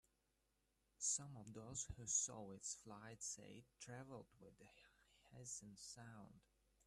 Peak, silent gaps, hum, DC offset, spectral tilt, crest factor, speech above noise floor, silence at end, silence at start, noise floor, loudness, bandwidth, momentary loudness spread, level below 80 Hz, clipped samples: -30 dBFS; none; none; under 0.1%; -2.5 dB/octave; 24 dB; 33 dB; 0.45 s; 1 s; -85 dBFS; -48 LUFS; 13 kHz; 24 LU; -74 dBFS; under 0.1%